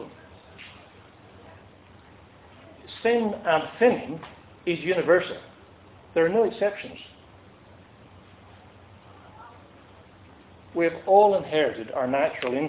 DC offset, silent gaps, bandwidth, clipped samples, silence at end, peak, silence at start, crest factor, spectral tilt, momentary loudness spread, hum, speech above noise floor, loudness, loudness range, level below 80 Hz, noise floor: under 0.1%; none; 4 kHz; under 0.1%; 0 s; -4 dBFS; 0 s; 22 dB; -9 dB/octave; 25 LU; none; 28 dB; -24 LUFS; 10 LU; -60 dBFS; -51 dBFS